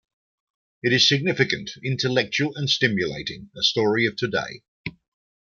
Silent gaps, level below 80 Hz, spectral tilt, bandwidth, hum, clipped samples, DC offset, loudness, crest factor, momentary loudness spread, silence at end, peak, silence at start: 4.68-4.84 s; -60 dBFS; -4 dB/octave; 7.4 kHz; none; under 0.1%; under 0.1%; -22 LUFS; 22 dB; 17 LU; 0.65 s; -4 dBFS; 0.85 s